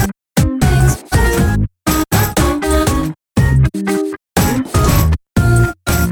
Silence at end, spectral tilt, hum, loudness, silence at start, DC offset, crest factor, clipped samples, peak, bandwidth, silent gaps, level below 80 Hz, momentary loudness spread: 0 s; -5.5 dB/octave; none; -15 LUFS; 0 s; under 0.1%; 14 dB; under 0.1%; 0 dBFS; over 20 kHz; none; -20 dBFS; 5 LU